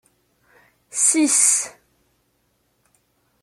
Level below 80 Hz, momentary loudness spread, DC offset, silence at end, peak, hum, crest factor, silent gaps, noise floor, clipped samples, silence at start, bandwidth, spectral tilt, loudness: -74 dBFS; 16 LU; under 0.1%; 1.75 s; -2 dBFS; none; 22 dB; none; -67 dBFS; under 0.1%; 0.95 s; 15.5 kHz; 0.5 dB/octave; -16 LUFS